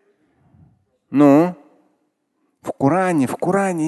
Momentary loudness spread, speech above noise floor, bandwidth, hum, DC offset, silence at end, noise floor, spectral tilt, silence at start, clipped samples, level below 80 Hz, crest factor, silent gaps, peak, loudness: 12 LU; 54 dB; 12.5 kHz; none; under 0.1%; 0 s; -69 dBFS; -7.5 dB/octave; 1.1 s; under 0.1%; -62 dBFS; 18 dB; none; 0 dBFS; -17 LUFS